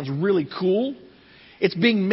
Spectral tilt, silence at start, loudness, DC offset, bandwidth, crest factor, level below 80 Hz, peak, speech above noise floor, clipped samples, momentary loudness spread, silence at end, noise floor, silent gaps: -10.5 dB/octave; 0 s; -22 LUFS; under 0.1%; 5.8 kHz; 18 dB; -66 dBFS; -4 dBFS; 29 dB; under 0.1%; 8 LU; 0 s; -50 dBFS; none